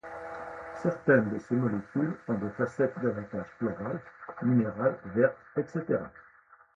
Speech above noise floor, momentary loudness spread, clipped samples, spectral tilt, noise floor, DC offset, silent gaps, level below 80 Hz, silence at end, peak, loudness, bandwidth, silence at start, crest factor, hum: 30 dB; 15 LU; under 0.1%; -9.5 dB/octave; -59 dBFS; under 0.1%; none; -64 dBFS; 0.55 s; -10 dBFS; -30 LUFS; 7.8 kHz; 0.05 s; 20 dB; none